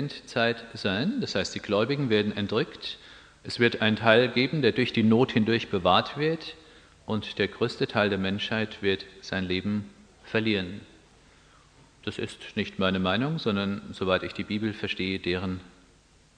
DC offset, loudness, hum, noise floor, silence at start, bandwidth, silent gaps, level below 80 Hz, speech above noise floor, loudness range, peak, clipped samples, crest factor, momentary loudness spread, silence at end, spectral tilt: under 0.1%; -27 LUFS; none; -59 dBFS; 0 s; 9.8 kHz; none; -60 dBFS; 32 dB; 7 LU; -2 dBFS; under 0.1%; 24 dB; 12 LU; 0.7 s; -6 dB/octave